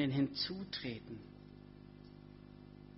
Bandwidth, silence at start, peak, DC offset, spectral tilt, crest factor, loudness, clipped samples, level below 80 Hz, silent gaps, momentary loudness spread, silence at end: 5.8 kHz; 0 s; -24 dBFS; under 0.1%; -4.5 dB/octave; 18 dB; -40 LUFS; under 0.1%; -66 dBFS; none; 21 LU; 0 s